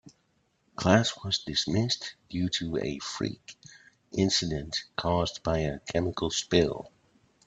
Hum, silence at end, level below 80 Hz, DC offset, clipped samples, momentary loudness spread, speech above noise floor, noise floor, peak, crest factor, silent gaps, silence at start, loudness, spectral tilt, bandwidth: none; 0.6 s; -52 dBFS; under 0.1%; under 0.1%; 12 LU; 43 dB; -71 dBFS; -6 dBFS; 24 dB; none; 0.05 s; -29 LUFS; -4.5 dB/octave; 9.2 kHz